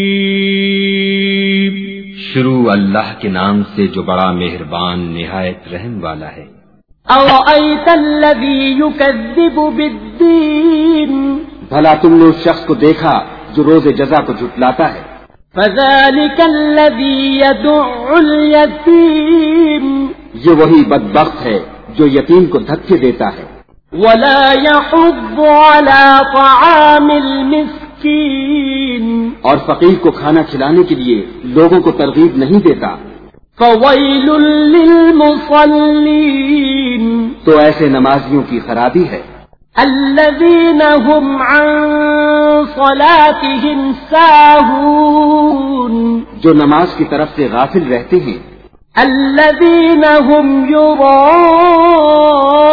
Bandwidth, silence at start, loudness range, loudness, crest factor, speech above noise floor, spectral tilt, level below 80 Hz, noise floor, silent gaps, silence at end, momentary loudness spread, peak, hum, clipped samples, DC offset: 5.4 kHz; 0 s; 5 LU; -9 LUFS; 8 dB; 38 dB; -8 dB/octave; -38 dBFS; -46 dBFS; none; 0 s; 11 LU; 0 dBFS; none; 1%; under 0.1%